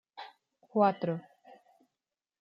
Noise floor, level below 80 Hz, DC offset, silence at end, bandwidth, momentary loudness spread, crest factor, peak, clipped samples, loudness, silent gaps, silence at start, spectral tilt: under -90 dBFS; -84 dBFS; under 0.1%; 0.85 s; 5.6 kHz; 21 LU; 22 dB; -14 dBFS; under 0.1%; -31 LUFS; none; 0.15 s; -9.5 dB/octave